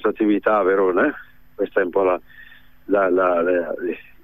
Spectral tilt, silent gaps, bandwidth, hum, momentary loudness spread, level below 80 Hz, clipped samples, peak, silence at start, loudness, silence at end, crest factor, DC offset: -8.5 dB/octave; none; 14.5 kHz; none; 10 LU; -56 dBFS; under 0.1%; -6 dBFS; 0 s; -20 LUFS; 0.2 s; 14 dB; 0.5%